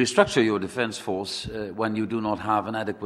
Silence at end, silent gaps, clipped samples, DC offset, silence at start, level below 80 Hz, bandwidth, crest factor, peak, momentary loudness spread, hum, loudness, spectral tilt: 0 s; none; under 0.1%; under 0.1%; 0 s; -54 dBFS; 13.5 kHz; 22 dB; -2 dBFS; 10 LU; none; -26 LUFS; -4.5 dB/octave